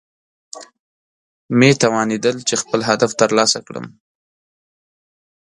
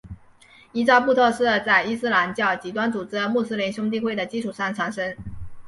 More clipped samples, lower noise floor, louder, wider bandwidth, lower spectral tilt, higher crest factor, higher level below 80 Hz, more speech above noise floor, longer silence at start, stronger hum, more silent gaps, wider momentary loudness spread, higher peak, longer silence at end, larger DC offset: neither; first, under -90 dBFS vs -52 dBFS; first, -16 LUFS vs -22 LUFS; about the same, 11.5 kHz vs 11.5 kHz; about the same, -4 dB/octave vs -5 dB/octave; about the same, 20 dB vs 20 dB; second, -62 dBFS vs -52 dBFS; first, over 74 dB vs 30 dB; first, 0.55 s vs 0.05 s; neither; first, 0.80-1.49 s vs none; first, 23 LU vs 11 LU; first, 0 dBFS vs -4 dBFS; first, 1.6 s vs 0 s; neither